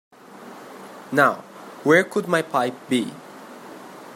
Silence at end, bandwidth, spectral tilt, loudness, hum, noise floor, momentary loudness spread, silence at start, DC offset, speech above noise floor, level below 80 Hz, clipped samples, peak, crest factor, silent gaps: 0 s; 16 kHz; -5 dB/octave; -21 LUFS; none; -42 dBFS; 23 LU; 0.35 s; under 0.1%; 22 dB; -74 dBFS; under 0.1%; -2 dBFS; 22 dB; none